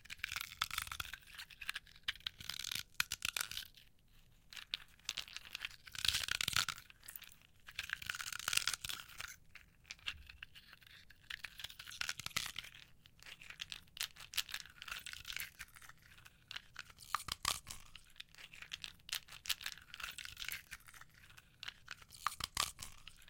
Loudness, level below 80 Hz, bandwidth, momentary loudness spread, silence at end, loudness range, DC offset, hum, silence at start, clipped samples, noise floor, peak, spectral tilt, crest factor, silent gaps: -43 LUFS; -66 dBFS; 17 kHz; 21 LU; 0 s; 6 LU; under 0.1%; none; 0 s; under 0.1%; -66 dBFS; -10 dBFS; 0.5 dB/octave; 36 dB; none